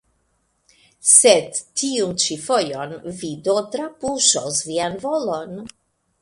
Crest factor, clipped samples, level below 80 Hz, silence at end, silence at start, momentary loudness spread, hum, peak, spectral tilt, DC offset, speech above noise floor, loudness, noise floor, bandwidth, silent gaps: 22 dB; under 0.1%; -60 dBFS; 0.55 s; 1.05 s; 18 LU; none; 0 dBFS; -1.5 dB/octave; under 0.1%; 47 dB; -18 LUFS; -67 dBFS; 11.5 kHz; none